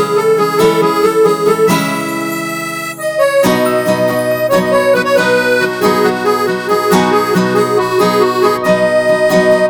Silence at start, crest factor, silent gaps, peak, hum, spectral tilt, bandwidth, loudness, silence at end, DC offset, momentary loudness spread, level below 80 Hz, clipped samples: 0 s; 12 dB; none; 0 dBFS; none; -5 dB/octave; over 20 kHz; -12 LUFS; 0 s; under 0.1%; 6 LU; -50 dBFS; under 0.1%